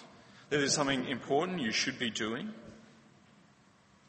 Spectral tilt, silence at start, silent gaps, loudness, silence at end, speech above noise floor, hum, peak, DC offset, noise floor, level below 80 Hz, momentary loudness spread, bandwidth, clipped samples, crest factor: -3 dB/octave; 0 s; none; -32 LUFS; 1.3 s; 31 dB; none; -16 dBFS; under 0.1%; -64 dBFS; -68 dBFS; 14 LU; 8.4 kHz; under 0.1%; 20 dB